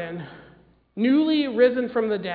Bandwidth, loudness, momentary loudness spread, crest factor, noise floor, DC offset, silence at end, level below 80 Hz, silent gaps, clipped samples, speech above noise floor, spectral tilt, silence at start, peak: 4.9 kHz; -21 LUFS; 19 LU; 16 dB; -54 dBFS; under 0.1%; 0 s; -62 dBFS; none; under 0.1%; 33 dB; -9 dB/octave; 0 s; -6 dBFS